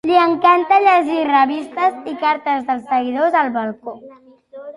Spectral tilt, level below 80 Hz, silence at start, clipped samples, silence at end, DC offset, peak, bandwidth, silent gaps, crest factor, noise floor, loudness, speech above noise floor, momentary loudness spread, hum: -5 dB/octave; -64 dBFS; 0.05 s; under 0.1%; 0.05 s; under 0.1%; -2 dBFS; 11 kHz; none; 16 dB; -36 dBFS; -16 LUFS; 20 dB; 12 LU; none